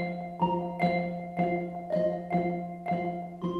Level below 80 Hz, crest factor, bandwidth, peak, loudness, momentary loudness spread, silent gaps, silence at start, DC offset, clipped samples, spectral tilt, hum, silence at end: -60 dBFS; 16 dB; 4.8 kHz; -14 dBFS; -31 LUFS; 6 LU; none; 0 s; under 0.1%; under 0.1%; -9 dB/octave; none; 0 s